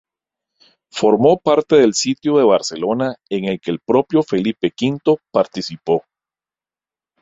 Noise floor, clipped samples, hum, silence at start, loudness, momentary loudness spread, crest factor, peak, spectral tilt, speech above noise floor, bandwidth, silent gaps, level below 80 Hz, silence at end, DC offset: under -90 dBFS; under 0.1%; none; 0.95 s; -17 LUFS; 9 LU; 16 dB; -2 dBFS; -5 dB/octave; over 74 dB; 8 kHz; none; -58 dBFS; 1.2 s; under 0.1%